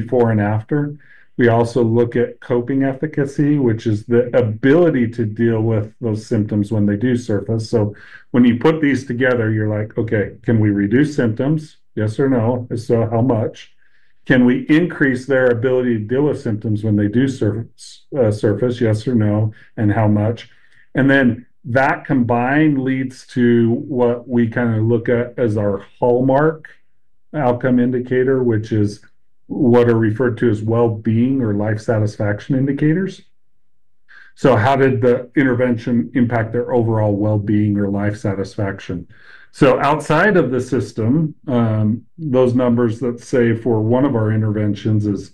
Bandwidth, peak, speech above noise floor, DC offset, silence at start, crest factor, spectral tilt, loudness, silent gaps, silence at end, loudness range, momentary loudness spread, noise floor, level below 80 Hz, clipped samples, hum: 9.8 kHz; -2 dBFS; 58 dB; 0.8%; 0 s; 16 dB; -8.5 dB/octave; -17 LUFS; none; 0.05 s; 2 LU; 7 LU; -74 dBFS; -48 dBFS; under 0.1%; none